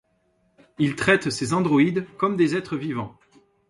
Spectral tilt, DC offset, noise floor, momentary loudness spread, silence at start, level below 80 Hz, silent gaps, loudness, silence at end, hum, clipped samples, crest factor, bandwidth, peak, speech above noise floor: -5.5 dB/octave; under 0.1%; -67 dBFS; 10 LU; 0.8 s; -58 dBFS; none; -23 LUFS; 0.6 s; none; under 0.1%; 18 dB; 11.5 kHz; -6 dBFS; 45 dB